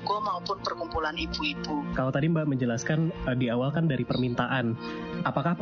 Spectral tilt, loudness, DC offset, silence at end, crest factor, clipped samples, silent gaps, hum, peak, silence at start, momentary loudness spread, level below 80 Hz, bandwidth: -5 dB/octave; -29 LUFS; under 0.1%; 0 s; 16 dB; under 0.1%; none; none; -12 dBFS; 0 s; 5 LU; -48 dBFS; 7 kHz